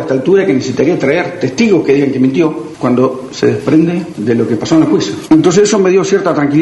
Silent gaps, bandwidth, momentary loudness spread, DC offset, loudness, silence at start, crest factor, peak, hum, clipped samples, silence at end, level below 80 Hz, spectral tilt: none; 11.5 kHz; 6 LU; under 0.1%; -11 LUFS; 0 s; 10 dB; 0 dBFS; none; under 0.1%; 0 s; -50 dBFS; -6 dB/octave